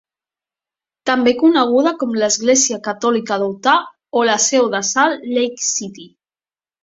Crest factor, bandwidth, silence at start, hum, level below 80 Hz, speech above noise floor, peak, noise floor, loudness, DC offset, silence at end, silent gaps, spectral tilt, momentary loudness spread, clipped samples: 16 dB; 8 kHz; 1.05 s; none; -64 dBFS; over 74 dB; -2 dBFS; under -90 dBFS; -16 LUFS; under 0.1%; 0.8 s; none; -2 dB/octave; 7 LU; under 0.1%